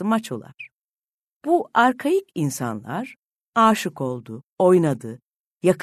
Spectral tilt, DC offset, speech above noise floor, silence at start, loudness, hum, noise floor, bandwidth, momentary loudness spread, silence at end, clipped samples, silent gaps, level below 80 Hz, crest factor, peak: -6 dB/octave; under 0.1%; over 69 dB; 0 s; -21 LUFS; none; under -90 dBFS; 13.5 kHz; 20 LU; 0 s; under 0.1%; 0.84-0.94 s, 1.14-1.40 s, 3.19-3.30 s, 3.41-3.52 s, 4.49-4.56 s, 5.36-5.55 s; -68 dBFS; 18 dB; -4 dBFS